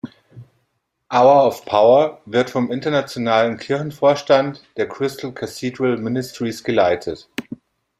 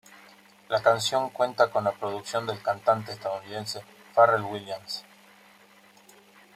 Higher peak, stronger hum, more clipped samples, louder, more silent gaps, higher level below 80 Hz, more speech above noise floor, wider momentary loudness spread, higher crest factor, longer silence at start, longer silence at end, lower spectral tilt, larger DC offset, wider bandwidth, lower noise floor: first, -2 dBFS vs -6 dBFS; neither; neither; first, -18 LUFS vs -27 LUFS; neither; first, -60 dBFS vs -74 dBFS; first, 53 dB vs 30 dB; about the same, 15 LU vs 14 LU; about the same, 18 dB vs 22 dB; second, 0.05 s vs 0.7 s; second, 0.45 s vs 1.55 s; first, -5.5 dB/octave vs -3.5 dB/octave; neither; about the same, 15 kHz vs 15.5 kHz; first, -71 dBFS vs -56 dBFS